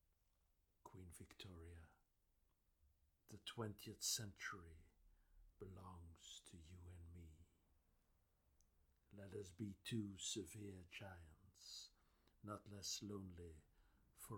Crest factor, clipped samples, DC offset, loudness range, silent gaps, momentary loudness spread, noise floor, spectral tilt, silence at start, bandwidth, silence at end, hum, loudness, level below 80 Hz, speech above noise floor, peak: 24 dB; under 0.1%; under 0.1%; 12 LU; none; 17 LU; -83 dBFS; -3 dB/octave; 0.85 s; 19 kHz; 0 s; none; -53 LUFS; -74 dBFS; 30 dB; -32 dBFS